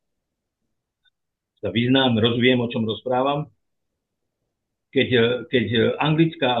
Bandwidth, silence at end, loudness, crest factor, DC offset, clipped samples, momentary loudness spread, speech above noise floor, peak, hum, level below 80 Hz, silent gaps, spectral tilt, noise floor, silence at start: 4.3 kHz; 0 s; -20 LUFS; 18 dB; under 0.1%; under 0.1%; 8 LU; 60 dB; -4 dBFS; none; -64 dBFS; none; -9 dB/octave; -80 dBFS; 1.65 s